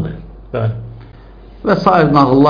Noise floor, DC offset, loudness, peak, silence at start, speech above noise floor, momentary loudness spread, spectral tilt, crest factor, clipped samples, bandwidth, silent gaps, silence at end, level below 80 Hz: -37 dBFS; under 0.1%; -14 LUFS; 0 dBFS; 0 s; 26 dB; 20 LU; -9 dB/octave; 14 dB; under 0.1%; 5.2 kHz; none; 0 s; -36 dBFS